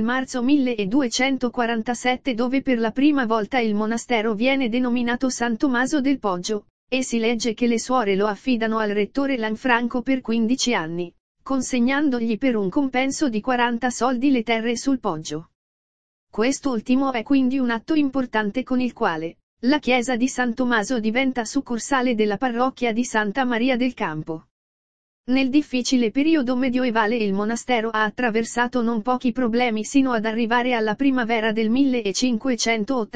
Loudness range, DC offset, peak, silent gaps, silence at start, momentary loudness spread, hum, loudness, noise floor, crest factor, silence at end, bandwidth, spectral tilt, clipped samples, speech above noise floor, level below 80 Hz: 2 LU; 1%; -2 dBFS; 6.70-6.87 s, 11.20-11.35 s, 15.55-16.27 s, 19.43-19.57 s, 24.51-25.24 s; 0 s; 4 LU; none; -22 LUFS; under -90 dBFS; 18 dB; 0 s; 9.6 kHz; -4 dB/octave; under 0.1%; over 69 dB; -52 dBFS